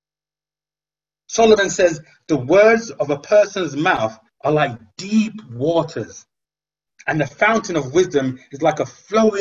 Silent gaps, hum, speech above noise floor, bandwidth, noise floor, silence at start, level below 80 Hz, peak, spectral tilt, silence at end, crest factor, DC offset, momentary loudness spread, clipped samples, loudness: none; 50 Hz at -45 dBFS; over 73 dB; 7.8 kHz; under -90 dBFS; 1.3 s; -54 dBFS; 0 dBFS; -5 dB/octave; 0 s; 18 dB; under 0.1%; 12 LU; under 0.1%; -18 LUFS